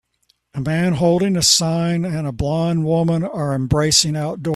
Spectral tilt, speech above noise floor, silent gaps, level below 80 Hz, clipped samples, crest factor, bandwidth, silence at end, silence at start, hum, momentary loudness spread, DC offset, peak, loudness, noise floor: -4.5 dB/octave; 46 dB; none; -42 dBFS; under 0.1%; 18 dB; 14 kHz; 0 s; 0.55 s; none; 9 LU; under 0.1%; 0 dBFS; -17 LUFS; -64 dBFS